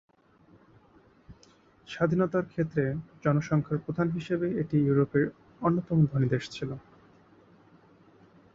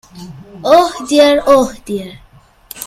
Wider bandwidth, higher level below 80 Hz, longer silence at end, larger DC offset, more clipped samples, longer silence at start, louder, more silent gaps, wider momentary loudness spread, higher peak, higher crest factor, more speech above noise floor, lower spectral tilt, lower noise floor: second, 7.6 kHz vs 16 kHz; second, -60 dBFS vs -44 dBFS; first, 1.75 s vs 0 s; neither; second, under 0.1% vs 0.2%; first, 1.3 s vs 0.15 s; second, -28 LUFS vs -12 LUFS; neither; second, 8 LU vs 24 LU; second, -12 dBFS vs 0 dBFS; about the same, 18 dB vs 14 dB; first, 33 dB vs 26 dB; first, -8.5 dB/octave vs -4 dB/octave; first, -60 dBFS vs -38 dBFS